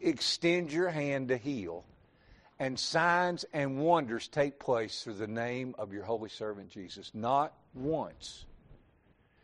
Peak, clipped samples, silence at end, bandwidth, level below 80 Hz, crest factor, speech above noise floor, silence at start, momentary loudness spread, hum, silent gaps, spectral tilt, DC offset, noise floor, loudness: -14 dBFS; under 0.1%; 0.7 s; 11 kHz; -64 dBFS; 20 dB; 34 dB; 0 s; 15 LU; none; none; -4.5 dB/octave; under 0.1%; -67 dBFS; -33 LUFS